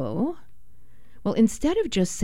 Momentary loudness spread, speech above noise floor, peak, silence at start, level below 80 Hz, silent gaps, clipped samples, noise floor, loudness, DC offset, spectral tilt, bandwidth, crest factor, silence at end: 10 LU; 32 dB; -8 dBFS; 0 s; -46 dBFS; none; under 0.1%; -55 dBFS; -25 LUFS; 2%; -5.5 dB/octave; 15.5 kHz; 16 dB; 0 s